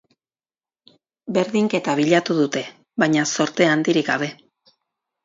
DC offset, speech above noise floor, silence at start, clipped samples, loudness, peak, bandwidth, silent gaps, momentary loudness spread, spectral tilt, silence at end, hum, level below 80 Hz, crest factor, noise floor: under 0.1%; over 71 dB; 1.25 s; under 0.1%; -20 LUFS; -2 dBFS; 7.8 kHz; none; 9 LU; -4.5 dB/octave; 0.9 s; none; -68 dBFS; 20 dB; under -90 dBFS